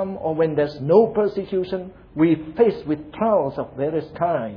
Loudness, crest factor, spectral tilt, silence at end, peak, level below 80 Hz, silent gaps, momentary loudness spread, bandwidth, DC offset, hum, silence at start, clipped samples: -21 LUFS; 18 dB; -10 dB/octave; 0 s; -2 dBFS; -52 dBFS; none; 10 LU; 5.4 kHz; under 0.1%; none; 0 s; under 0.1%